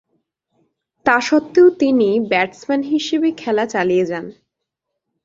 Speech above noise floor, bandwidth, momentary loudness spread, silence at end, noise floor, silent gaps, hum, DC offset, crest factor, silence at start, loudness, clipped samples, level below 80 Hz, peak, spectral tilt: 63 dB; 7.8 kHz; 9 LU; 0.95 s; -79 dBFS; none; none; under 0.1%; 16 dB; 1.05 s; -16 LUFS; under 0.1%; -60 dBFS; -2 dBFS; -5 dB/octave